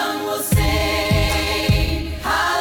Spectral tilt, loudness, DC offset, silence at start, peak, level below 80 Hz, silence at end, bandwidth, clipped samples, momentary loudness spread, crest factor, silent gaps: -4.5 dB/octave; -19 LUFS; under 0.1%; 0 s; -6 dBFS; -26 dBFS; 0 s; 17.5 kHz; under 0.1%; 5 LU; 14 dB; none